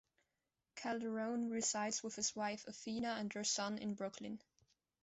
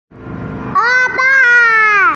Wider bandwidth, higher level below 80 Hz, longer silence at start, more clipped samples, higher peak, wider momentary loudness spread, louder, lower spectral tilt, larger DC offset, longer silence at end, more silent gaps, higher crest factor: about the same, 8.2 kHz vs 7.6 kHz; second, -80 dBFS vs -44 dBFS; first, 0.75 s vs 0.15 s; neither; second, -26 dBFS vs 0 dBFS; second, 10 LU vs 19 LU; second, -41 LUFS vs -9 LUFS; about the same, -2.5 dB/octave vs -3.5 dB/octave; neither; first, 0.65 s vs 0 s; neither; first, 18 dB vs 12 dB